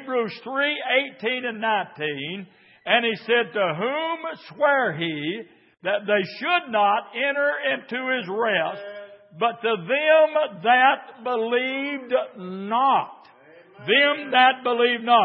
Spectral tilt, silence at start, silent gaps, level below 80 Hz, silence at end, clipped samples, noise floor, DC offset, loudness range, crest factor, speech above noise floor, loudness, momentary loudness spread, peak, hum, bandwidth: -8.5 dB/octave; 0 s; none; -82 dBFS; 0 s; under 0.1%; -50 dBFS; under 0.1%; 3 LU; 20 dB; 28 dB; -22 LUFS; 13 LU; -2 dBFS; none; 5.8 kHz